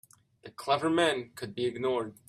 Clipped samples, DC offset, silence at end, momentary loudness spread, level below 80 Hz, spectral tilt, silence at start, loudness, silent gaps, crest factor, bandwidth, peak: under 0.1%; under 0.1%; 0.15 s; 14 LU; -72 dBFS; -4.5 dB/octave; 0.45 s; -30 LUFS; none; 18 dB; 14.5 kHz; -12 dBFS